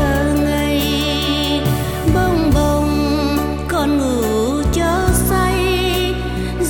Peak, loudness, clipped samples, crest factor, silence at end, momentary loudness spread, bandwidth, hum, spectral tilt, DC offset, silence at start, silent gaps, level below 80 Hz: -2 dBFS; -17 LUFS; under 0.1%; 14 dB; 0 s; 3 LU; 18 kHz; none; -5 dB/octave; under 0.1%; 0 s; none; -24 dBFS